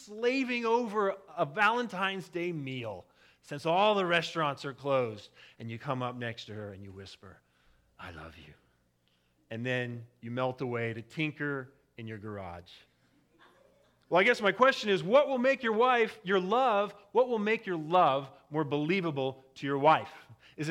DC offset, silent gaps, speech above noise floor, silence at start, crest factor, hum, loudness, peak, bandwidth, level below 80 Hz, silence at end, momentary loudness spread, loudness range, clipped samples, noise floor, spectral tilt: under 0.1%; none; 42 dB; 0 s; 22 dB; none; -30 LUFS; -10 dBFS; 13 kHz; -72 dBFS; 0 s; 19 LU; 14 LU; under 0.1%; -72 dBFS; -5.5 dB/octave